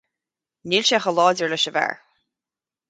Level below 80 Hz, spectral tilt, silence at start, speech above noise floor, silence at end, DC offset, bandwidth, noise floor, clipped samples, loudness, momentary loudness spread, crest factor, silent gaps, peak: -72 dBFS; -2.5 dB/octave; 0.65 s; over 70 dB; 0.95 s; under 0.1%; 9.4 kHz; under -90 dBFS; under 0.1%; -20 LUFS; 14 LU; 20 dB; none; -4 dBFS